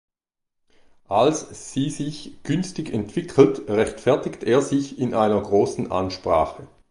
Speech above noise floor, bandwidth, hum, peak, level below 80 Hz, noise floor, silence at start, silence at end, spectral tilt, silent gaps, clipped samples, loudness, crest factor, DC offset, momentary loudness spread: 59 dB; 11.5 kHz; none; -2 dBFS; -50 dBFS; -81 dBFS; 1.1 s; 0.25 s; -6 dB/octave; none; under 0.1%; -22 LUFS; 20 dB; under 0.1%; 11 LU